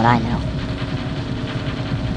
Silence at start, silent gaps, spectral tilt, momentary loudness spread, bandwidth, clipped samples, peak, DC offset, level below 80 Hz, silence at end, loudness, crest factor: 0 s; none; -7 dB/octave; 6 LU; 9.6 kHz; under 0.1%; 0 dBFS; under 0.1%; -32 dBFS; 0 s; -23 LUFS; 20 dB